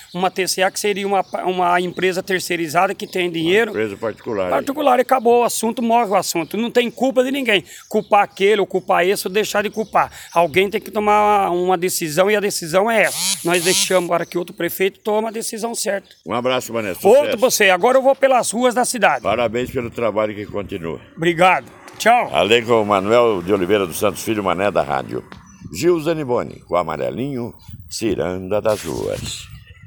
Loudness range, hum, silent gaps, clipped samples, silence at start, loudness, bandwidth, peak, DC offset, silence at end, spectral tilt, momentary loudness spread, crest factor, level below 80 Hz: 5 LU; none; none; under 0.1%; 0 s; -18 LUFS; 19 kHz; 0 dBFS; under 0.1%; 0 s; -3.5 dB/octave; 10 LU; 18 dB; -52 dBFS